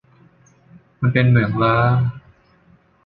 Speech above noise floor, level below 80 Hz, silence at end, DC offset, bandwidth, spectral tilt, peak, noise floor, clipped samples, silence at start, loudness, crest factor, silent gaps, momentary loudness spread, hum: 39 dB; -46 dBFS; 0.85 s; under 0.1%; 4.7 kHz; -9.5 dB/octave; 0 dBFS; -54 dBFS; under 0.1%; 1 s; -17 LUFS; 20 dB; none; 7 LU; none